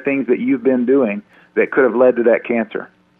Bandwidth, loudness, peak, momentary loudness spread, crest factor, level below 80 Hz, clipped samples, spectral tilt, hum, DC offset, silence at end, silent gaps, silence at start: 3.8 kHz; -16 LUFS; 0 dBFS; 11 LU; 16 dB; -66 dBFS; under 0.1%; -10 dB/octave; none; under 0.1%; 0.35 s; none; 0 s